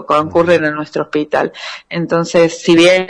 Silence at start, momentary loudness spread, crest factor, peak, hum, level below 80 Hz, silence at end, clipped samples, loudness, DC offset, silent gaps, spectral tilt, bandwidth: 0 s; 11 LU; 12 dB; 0 dBFS; none; -50 dBFS; 0 s; under 0.1%; -14 LUFS; under 0.1%; none; -5 dB/octave; 10.5 kHz